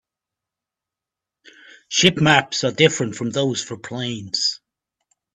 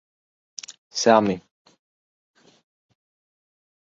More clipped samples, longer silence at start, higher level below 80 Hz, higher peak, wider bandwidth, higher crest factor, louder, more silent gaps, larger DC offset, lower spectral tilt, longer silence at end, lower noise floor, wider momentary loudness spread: neither; first, 1.9 s vs 0.7 s; first, -58 dBFS vs -66 dBFS; about the same, 0 dBFS vs -2 dBFS; first, 11.5 kHz vs 7.8 kHz; about the same, 22 dB vs 26 dB; about the same, -19 LUFS vs -21 LUFS; second, none vs 0.78-0.90 s; neither; about the same, -3.5 dB/octave vs -4 dB/octave; second, 0.8 s vs 2.5 s; about the same, -87 dBFS vs under -90 dBFS; second, 12 LU vs 21 LU